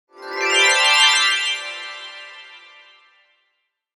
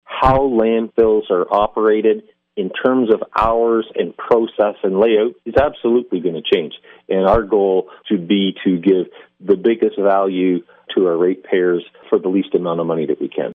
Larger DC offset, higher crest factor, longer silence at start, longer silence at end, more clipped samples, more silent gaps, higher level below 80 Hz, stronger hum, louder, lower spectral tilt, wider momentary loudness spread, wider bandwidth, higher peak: neither; about the same, 18 dB vs 14 dB; about the same, 0.2 s vs 0.1 s; first, 1.4 s vs 0 s; neither; neither; second, -74 dBFS vs -40 dBFS; neither; about the same, -15 LUFS vs -17 LUFS; second, 3.5 dB/octave vs -8.5 dB/octave; first, 22 LU vs 7 LU; first, 19 kHz vs 5 kHz; about the same, -2 dBFS vs -2 dBFS